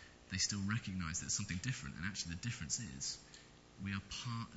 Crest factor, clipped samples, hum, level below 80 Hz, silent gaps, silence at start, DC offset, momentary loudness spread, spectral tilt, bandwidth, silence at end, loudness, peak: 20 dB; under 0.1%; none; -62 dBFS; none; 0 s; under 0.1%; 11 LU; -2.5 dB/octave; 8.2 kHz; 0 s; -41 LUFS; -24 dBFS